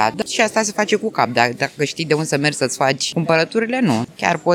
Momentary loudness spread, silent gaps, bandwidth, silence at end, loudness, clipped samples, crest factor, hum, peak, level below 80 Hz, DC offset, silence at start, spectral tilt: 3 LU; none; 17.5 kHz; 0 s; -18 LUFS; under 0.1%; 18 dB; none; 0 dBFS; -62 dBFS; under 0.1%; 0 s; -4 dB/octave